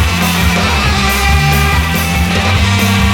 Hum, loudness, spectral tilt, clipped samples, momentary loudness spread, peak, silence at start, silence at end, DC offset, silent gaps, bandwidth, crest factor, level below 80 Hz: none; -11 LUFS; -4.5 dB/octave; under 0.1%; 2 LU; 0 dBFS; 0 s; 0 s; 0.4%; none; 19 kHz; 10 dB; -18 dBFS